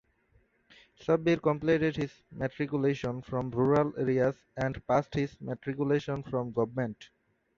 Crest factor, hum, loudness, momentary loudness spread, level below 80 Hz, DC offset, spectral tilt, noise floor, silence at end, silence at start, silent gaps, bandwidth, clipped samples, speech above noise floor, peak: 18 dB; none; -30 LUFS; 10 LU; -58 dBFS; under 0.1%; -8 dB/octave; -68 dBFS; 0.55 s; 1 s; none; 7.4 kHz; under 0.1%; 38 dB; -12 dBFS